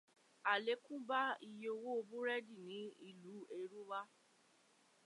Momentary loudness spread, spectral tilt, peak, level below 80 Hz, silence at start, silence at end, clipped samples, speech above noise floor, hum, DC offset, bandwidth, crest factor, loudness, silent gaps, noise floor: 15 LU; -4 dB/octave; -24 dBFS; under -90 dBFS; 0.45 s; 1 s; under 0.1%; 29 dB; none; under 0.1%; 11.5 kHz; 22 dB; -44 LUFS; none; -73 dBFS